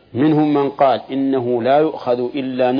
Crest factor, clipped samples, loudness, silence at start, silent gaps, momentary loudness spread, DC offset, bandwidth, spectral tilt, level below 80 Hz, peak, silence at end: 14 dB; under 0.1%; -17 LUFS; 0.15 s; none; 5 LU; under 0.1%; 5.2 kHz; -9.5 dB/octave; -62 dBFS; -2 dBFS; 0 s